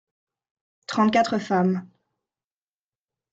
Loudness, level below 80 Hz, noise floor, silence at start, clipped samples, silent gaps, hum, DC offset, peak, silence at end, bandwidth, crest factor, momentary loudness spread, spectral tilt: -23 LUFS; -68 dBFS; under -90 dBFS; 0.9 s; under 0.1%; none; none; under 0.1%; -8 dBFS; 1.45 s; 7.8 kHz; 18 dB; 11 LU; -6 dB/octave